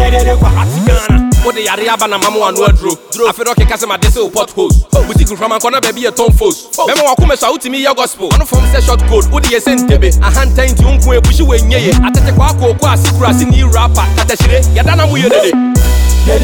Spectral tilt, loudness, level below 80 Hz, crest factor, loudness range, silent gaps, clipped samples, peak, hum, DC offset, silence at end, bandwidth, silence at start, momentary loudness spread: -5 dB/octave; -10 LUFS; -12 dBFS; 8 dB; 2 LU; none; under 0.1%; 0 dBFS; none; under 0.1%; 0 s; 19 kHz; 0 s; 4 LU